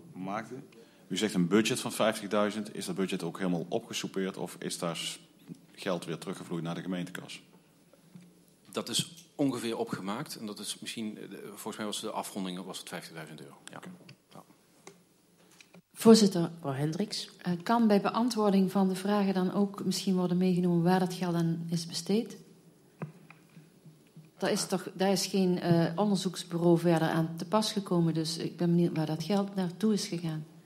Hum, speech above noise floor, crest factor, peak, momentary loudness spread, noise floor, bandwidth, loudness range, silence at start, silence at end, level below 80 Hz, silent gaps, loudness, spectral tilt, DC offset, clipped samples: none; 33 dB; 24 dB; -8 dBFS; 16 LU; -64 dBFS; 15.5 kHz; 11 LU; 0.05 s; 0.05 s; -78 dBFS; none; -30 LUFS; -5.5 dB/octave; under 0.1%; under 0.1%